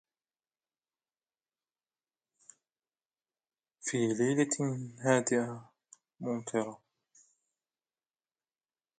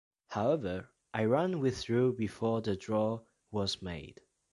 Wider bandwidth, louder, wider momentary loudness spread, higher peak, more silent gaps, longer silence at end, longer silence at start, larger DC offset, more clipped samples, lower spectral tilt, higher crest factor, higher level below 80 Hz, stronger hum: second, 9.6 kHz vs 11.5 kHz; about the same, -32 LUFS vs -33 LUFS; about the same, 12 LU vs 13 LU; first, -12 dBFS vs -16 dBFS; neither; first, 2.25 s vs 0.4 s; first, 3.85 s vs 0.3 s; neither; neither; second, -5 dB/octave vs -6.5 dB/octave; first, 24 dB vs 18 dB; second, -80 dBFS vs -58 dBFS; neither